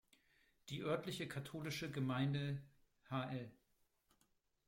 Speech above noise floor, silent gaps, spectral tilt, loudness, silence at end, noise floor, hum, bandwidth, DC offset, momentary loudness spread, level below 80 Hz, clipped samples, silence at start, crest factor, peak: 38 dB; none; -6 dB/octave; -44 LUFS; 1.15 s; -81 dBFS; none; 16.5 kHz; under 0.1%; 10 LU; -76 dBFS; under 0.1%; 0.65 s; 20 dB; -26 dBFS